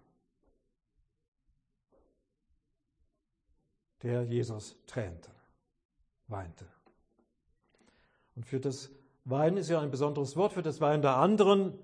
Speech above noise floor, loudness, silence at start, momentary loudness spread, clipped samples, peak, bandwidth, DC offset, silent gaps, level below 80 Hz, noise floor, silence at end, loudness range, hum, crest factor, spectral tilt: 47 dB; -31 LUFS; 4.05 s; 19 LU; under 0.1%; -12 dBFS; 10.5 kHz; under 0.1%; 5.85-5.89 s; -68 dBFS; -77 dBFS; 0 s; 16 LU; none; 22 dB; -7 dB/octave